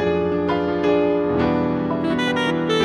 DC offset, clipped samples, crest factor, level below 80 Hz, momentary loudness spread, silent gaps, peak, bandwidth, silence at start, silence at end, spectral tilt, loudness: under 0.1%; under 0.1%; 12 dB; -46 dBFS; 3 LU; none; -8 dBFS; 11 kHz; 0 s; 0 s; -6.5 dB/octave; -20 LUFS